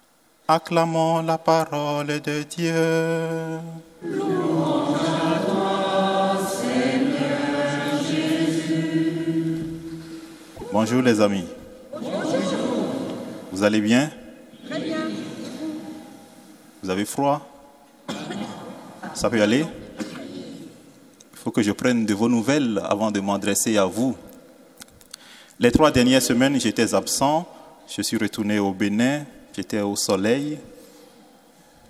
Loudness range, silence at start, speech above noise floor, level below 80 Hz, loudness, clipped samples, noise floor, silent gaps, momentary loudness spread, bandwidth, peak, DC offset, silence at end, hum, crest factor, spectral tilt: 6 LU; 0.5 s; 31 dB; -54 dBFS; -22 LUFS; under 0.1%; -52 dBFS; none; 17 LU; 16 kHz; -2 dBFS; under 0.1%; 1.05 s; none; 22 dB; -4.5 dB/octave